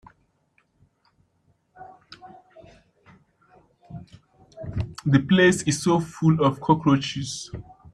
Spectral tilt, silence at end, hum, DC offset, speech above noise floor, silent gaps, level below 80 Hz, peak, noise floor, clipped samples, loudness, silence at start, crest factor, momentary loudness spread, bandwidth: -5.5 dB/octave; 0.3 s; none; under 0.1%; 46 dB; none; -52 dBFS; -4 dBFS; -67 dBFS; under 0.1%; -22 LUFS; 1.8 s; 22 dB; 25 LU; 12.5 kHz